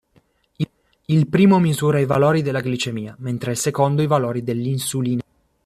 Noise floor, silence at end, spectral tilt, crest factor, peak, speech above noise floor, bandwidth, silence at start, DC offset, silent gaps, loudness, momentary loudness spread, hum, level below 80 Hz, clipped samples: -60 dBFS; 0.45 s; -6 dB/octave; 16 dB; -4 dBFS; 42 dB; 14.5 kHz; 0.6 s; under 0.1%; none; -20 LUFS; 13 LU; none; -56 dBFS; under 0.1%